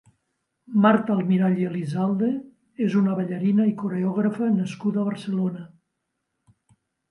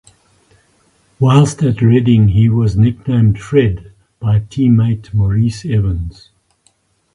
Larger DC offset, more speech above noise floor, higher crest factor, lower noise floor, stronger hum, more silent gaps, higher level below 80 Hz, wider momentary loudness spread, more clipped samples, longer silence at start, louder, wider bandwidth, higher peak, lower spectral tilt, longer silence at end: neither; first, 56 dB vs 46 dB; about the same, 18 dB vs 14 dB; first, -79 dBFS vs -58 dBFS; neither; neither; second, -70 dBFS vs -32 dBFS; about the same, 7 LU vs 8 LU; neither; second, 0.7 s vs 1.2 s; second, -23 LUFS vs -13 LUFS; about the same, 10.5 kHz vs 11 kHz; second, -6 dBFS vs 0 dBFS; about the same, -8.5 dB/octave vs -8 dB/octave; first, 1.45 s vs 1.05 s